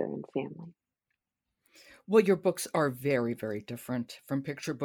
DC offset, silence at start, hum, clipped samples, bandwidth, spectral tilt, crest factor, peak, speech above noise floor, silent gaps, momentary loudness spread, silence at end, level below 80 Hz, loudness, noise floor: under 0.1%; 0 s; none; under 0.1%; 19 kHz; -6 dB/octave; 22 dB; -10 dBFS; 55 dB; none; 13 LU; 0 s; -74 dBFS; -31 LUFS; -86 dBFS